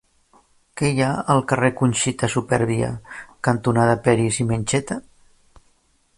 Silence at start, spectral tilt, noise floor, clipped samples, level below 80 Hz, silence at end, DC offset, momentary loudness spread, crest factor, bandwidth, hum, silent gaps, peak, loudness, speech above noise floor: 0.75 s; -5.5 dB/octave; -62 dBFS; under 0.1%; -48 dBFS; 1.2 s; under 0.1%; 11 LU; 18 dB; 11.5 kHz; none; none; -2 dBFS; -21 LUFS; 42 dB